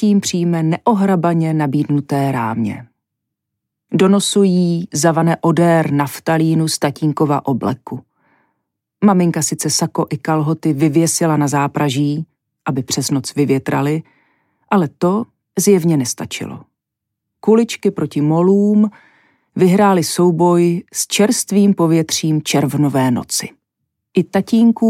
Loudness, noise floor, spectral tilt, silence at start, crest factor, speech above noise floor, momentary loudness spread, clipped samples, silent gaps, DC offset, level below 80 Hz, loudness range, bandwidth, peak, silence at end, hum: -15 LUFS; -79 dBFS; -5.5 dB/octave; 0 s; 14 dB; 65 dB; 9 LU; under 0.1%; none; under 0.1%; -62 dBFS; 4 LU; 16 kHz; -2 dBFS; 0 s; none